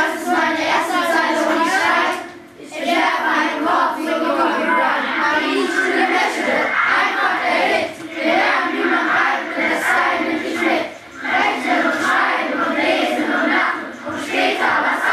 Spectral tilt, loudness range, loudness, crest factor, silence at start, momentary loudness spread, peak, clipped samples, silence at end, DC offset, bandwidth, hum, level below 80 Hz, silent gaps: -2.5 dB/octave; 1 LU; -17 LUFS; 14 dB; 0 s; 5 LU; -4 dBFS; under 0.1%; 0 s; under 0.1%; 14 kHz; none; -62 dBFS; none